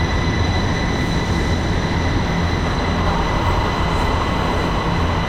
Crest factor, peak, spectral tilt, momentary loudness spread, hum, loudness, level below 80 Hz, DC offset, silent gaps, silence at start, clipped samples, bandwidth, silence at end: 12 dB; -6 dBFS; -6 dB/octave; 1 LU; none; -19 LUFS; -24 dBFS; under 0.1%; none; 0 s; under 0.1%; 14.5 kHz; 0 s